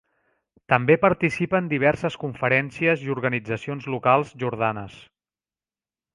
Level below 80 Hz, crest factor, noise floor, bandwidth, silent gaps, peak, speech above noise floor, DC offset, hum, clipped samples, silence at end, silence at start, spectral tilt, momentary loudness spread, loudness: -58 dBFS; 24 dB; under -90 dBFS; 11.5 kHz; none; 0 dBFS; over 67 dB; under 0.1%; none; under 0.1%; 1.2 s; 0.7 s; -7 dB/octave; 10 LU; -22 LUFS